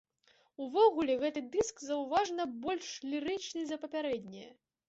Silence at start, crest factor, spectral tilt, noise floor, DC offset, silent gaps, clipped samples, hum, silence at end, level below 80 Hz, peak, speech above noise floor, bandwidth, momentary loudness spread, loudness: 0.6 s; 20 dB; -2.5 dB/octave; -70 dBFS; under 0.1%; none; under 0.1%; none; 0.35 s; -70 dBFS; -14 dBFS; 36 dB; 8 kHz; 11 LU; -34 LUFS